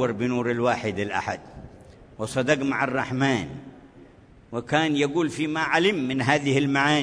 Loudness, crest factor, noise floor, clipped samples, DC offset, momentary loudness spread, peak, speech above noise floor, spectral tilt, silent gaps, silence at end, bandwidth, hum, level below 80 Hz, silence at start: -24 LUFS; 20 dB; -50 dBFS; under 0.1%; under 0.1%; 14 LU; -6 dBFS; 27 dB; -5 dB/octave; none; 0 s; 10.5 kHz; none; -56 dBFS; 0 s